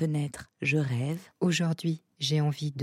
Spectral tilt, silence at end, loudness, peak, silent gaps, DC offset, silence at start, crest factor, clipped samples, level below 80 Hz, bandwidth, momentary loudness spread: -5.5 dB/octave; 0 s; -30 LUFS; -14 dBFS; none; under 0.1%; 0 s; 14 dB; under 0.1%; -66 dBFS; 13.5 kHz; 6 LU